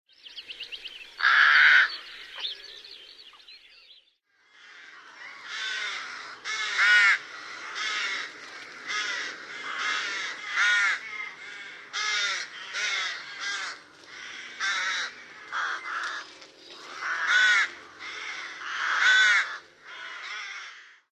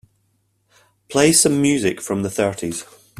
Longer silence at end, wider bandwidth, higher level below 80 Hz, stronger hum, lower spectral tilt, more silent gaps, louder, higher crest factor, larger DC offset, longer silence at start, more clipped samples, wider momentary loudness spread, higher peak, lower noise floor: about the same, 0.25 s vs 0.35 s; second, 11 kHz vs 15 kHz; second, -80 dBFS vs -54 dBFS; neither; second, 2.5 dB/octave vs -3.5 dB/octave; neither; second, -25 LUFS vs -18 LUFS; about the same, 22 dB vs 20 dB; neither; second, 0.25 s vs 1.1 s; neither; first, 23 LU vs 14 LU; second, -6 dBFS vs 0 dBFS; about the same, -66 dBFS vs -66 dBFS